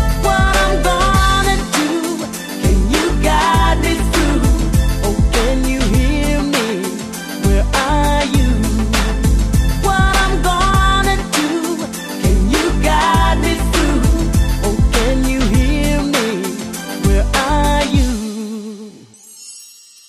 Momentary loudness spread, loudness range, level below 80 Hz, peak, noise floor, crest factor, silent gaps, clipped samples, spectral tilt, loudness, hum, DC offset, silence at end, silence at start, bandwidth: 9 LU; 2 LU; -18 dBFS; 0 dBFS; -40 dBFS; 14 dB; none; under 0.1%; -5 dB/octave; -15 LUFS; none; under 0.1%; 0.4 s; 0 s; 13 kHz